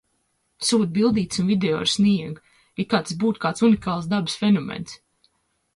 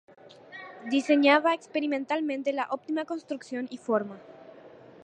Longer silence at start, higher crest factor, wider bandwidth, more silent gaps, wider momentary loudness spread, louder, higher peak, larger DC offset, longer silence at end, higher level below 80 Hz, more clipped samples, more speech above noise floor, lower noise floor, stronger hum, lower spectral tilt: first, 0.6 s vs 0.25 s; about the same, 16 dB vs 20 dB; first, 11.5 kHz vs 9.4 kHz; neither; second, 14 LU vs 20 LU; first, -22 LUFS vs -27 LUFS; about the same, -6 dBFS vs -8 dBFS; neither; first, 0.8 s vs 0.35 s; first, -56 dBFS vs -82 dBFS; neither; first, 49 dB vs 23 dB; first, -70 dBFS vs -50 dBFS; neither; about the same, -5 dB/octave vs -4.5 dB/octave